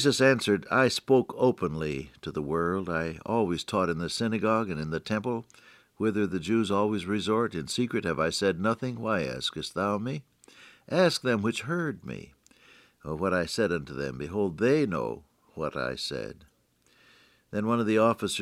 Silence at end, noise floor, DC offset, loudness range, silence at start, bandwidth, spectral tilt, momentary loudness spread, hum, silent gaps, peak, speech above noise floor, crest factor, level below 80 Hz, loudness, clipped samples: 0 s; -66 dBFS; under 0.1%; 3 LU; 0 s; 15.5 kHz; -5 dB/octave; 12 LU; none; none; -8 dBFS; 39 dB; 20 dB; -60 dBFS; -28 LUFS; under 0.1%